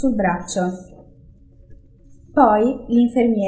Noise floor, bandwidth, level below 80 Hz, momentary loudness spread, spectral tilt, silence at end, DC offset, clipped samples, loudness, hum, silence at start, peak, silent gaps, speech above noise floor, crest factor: -47 dBFS; 8 kHz; -46 dBFS; 9 LU; -6.5 dB/octave; 0 s; under 0.1%; under 0.1%; -18 LUFS; none; 0 s; 0 dBFS; none; 30 dB; 20 dB